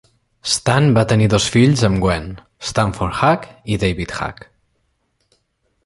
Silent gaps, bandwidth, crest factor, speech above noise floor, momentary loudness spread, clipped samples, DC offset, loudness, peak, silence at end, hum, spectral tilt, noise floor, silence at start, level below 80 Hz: none; 11.5 kHz; 16 dB; 50 dB; 12 LU; under 0.1%; under 0.1%; -17 LUFS; -2 dBFS; 1.5 s; none; -5.5 dB/octave; -67 dBFS; 0.45 s; -38 dBFS